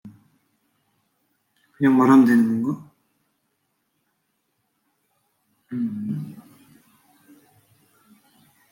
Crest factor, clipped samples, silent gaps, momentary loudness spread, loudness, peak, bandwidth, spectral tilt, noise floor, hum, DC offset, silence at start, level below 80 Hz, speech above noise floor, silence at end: 20 dB; under 0.1%; none; 20 LU; -20 LUFS; -4 dBFS; 16.5 kHz; -8 dB/octave; -73 dBFS; none; under 0.1%; 0.05 s; -74 dBFS; 57 dB; 2.3 s